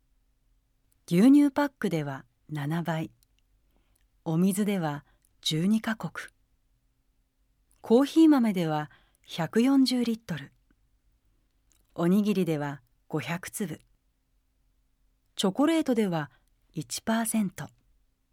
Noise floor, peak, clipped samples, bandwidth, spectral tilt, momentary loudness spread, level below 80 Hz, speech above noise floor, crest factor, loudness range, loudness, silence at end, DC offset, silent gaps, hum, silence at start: -71 dBFS; -10 dBFS; under 0.1%; 17 kHz; -5.5 dB/octave; 20 LU; -68 dBFS; 46 dB; 18 dB; 6 LU; -27 LUFS; 0.65 s; under 0.1%; none; none; 1.1 s